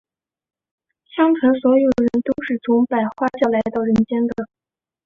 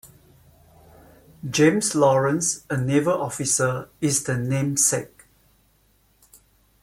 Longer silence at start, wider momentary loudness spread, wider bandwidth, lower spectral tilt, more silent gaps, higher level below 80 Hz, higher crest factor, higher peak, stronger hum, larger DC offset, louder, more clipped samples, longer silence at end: first, 1.15 s vs 0.05 s; about the same, 8 LU vs 8 LU; second, 7 kHz vs 16.5 kHz; first, -8 dB/octave vs -4.5 dB/octave; neither; first, -52 dBFS vs -58 dBFS; about the same, 16 dB vs 18 dB; about the same, -4 dBFS vs -6 dBFS; neither; neither; first, -18 LUFS vs -21 LUFS; neither; second, 0.6 s vs 1.75 s